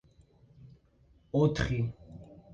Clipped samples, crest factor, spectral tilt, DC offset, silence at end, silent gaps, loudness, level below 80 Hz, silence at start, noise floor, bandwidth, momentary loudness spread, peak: under 0.1%; 20 dB; -7 dB/octave; under 0.1%; 0 s; none; -31 LUFS; -50 dBFS; 0.6 s; -64 dBFS; 8.8 kHz; 23 LU; -14 dBFS